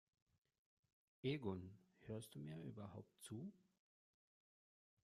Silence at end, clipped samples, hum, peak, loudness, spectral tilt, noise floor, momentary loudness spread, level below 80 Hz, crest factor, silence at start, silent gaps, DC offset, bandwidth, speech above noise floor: 1.5 s; under 0.1%; none; -32 dBFS; -52 LUFS; -6.5 dB/octave; under -90 dBFS; 12 LU; -84 dBFS; 22 dB; 1.25 s; none; under 0.1%; 13.5 kHz; over 39 dB